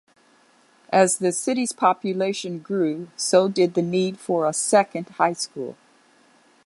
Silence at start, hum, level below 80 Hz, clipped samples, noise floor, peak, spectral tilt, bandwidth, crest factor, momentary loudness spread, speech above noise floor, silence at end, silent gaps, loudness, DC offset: 0.9 s; none; -74 dBFS; under 0.1%; -58 dBFS; -4 dBFS; -4 dB/octave; 11.5 kHz; 20 dB; 9 LU; 36 dB; 0.9 s; none; -22 LUFS; under 0.1%